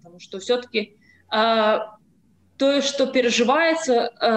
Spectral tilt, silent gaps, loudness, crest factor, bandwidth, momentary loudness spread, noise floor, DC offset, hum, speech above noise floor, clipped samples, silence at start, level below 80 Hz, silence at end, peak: -3 dB/octave; none; -21 LUFS; 14 dB; 9 kHz; 13 LU; -60 dBFS; under 0.1%; none; 39 dB; under 0.1%; 0.2 s; -68 dBFS; 0 s; -8 dBFS